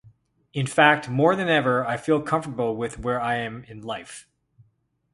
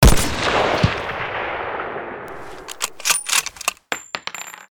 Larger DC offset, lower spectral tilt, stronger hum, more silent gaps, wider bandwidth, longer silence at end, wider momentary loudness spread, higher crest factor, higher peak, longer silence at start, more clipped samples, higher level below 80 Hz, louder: neither; first, -5.5 dB/octave vs -3.5 dB/octave; neither; neither; second, 11.5 kHz vs over 20 kHz; first, 0.95 s vs 0.05 s; about the same, 16 LU vs 15 LU; about the same, 22 dB vs 20 dB; about the same, -2 dBFS vs 0 dBFS; first, 0.55 s vs 0 s; neither; second, -54 dBFS vs -26 dBFS; about the same, -23 LUFS vs -21 LUFS